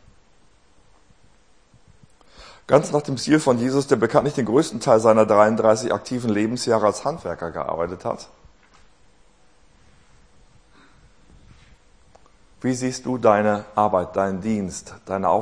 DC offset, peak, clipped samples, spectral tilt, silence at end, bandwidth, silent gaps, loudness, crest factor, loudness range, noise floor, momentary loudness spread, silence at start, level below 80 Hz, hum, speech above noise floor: 0.2%; 0 dBFS; under 0.1%; -5.5 dB/octave; 0 s; 10.5 kHz; none; -21 LUFS; 22 dB; 14 LU; -58 dBFS; 13 LU; 2.4 s; -56 dBFS; none; 38 dB